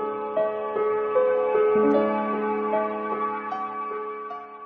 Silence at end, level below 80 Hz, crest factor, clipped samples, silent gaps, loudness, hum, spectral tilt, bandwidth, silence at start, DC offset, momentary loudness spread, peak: 0 s; -70 dBFS; 14 dB; under 0.1%; none; -25 LUFS; none; -5 dB/octave; 4.8 kHz; 0 s; under 0.1%; 11 LU; -10 dBFS